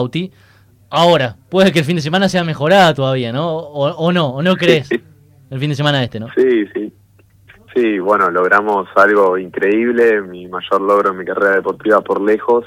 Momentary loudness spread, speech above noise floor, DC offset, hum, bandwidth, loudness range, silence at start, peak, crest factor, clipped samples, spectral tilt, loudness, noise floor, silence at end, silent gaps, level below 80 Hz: 10 LU; 35 dB; under 0.1%; none; 16 kHz; 3 LU; 0 s; 0 dBFS; 14 dB; under 0.1%; -6 dB/octave; -14 LUFS; -49 dBFS; 0 s; none; -54 dBFS